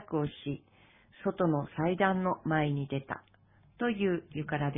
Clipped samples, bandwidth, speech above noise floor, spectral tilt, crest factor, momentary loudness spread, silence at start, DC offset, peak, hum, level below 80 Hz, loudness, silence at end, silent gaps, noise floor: under 0.1%; 3.8 kHz; 30 dB; -11 dB/octave; 20 dB; 12 LU; 0 s; under 0.1%; -12 dBFS; none; -62 dBFS; -32 LUFS; 0 s; none; -61 dBFS